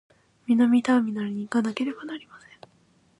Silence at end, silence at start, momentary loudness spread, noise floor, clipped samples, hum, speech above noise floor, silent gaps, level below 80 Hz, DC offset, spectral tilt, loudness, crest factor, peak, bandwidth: 0.8 s; 0.5 s; 18 LU; -62 dBFS; under 0.1%; none; 38 dB; none; -74 dBFS; under 0.1%; -6 dB/octave; -24 LUFS; 16 dB; -10 dBFS; 10.5 kHz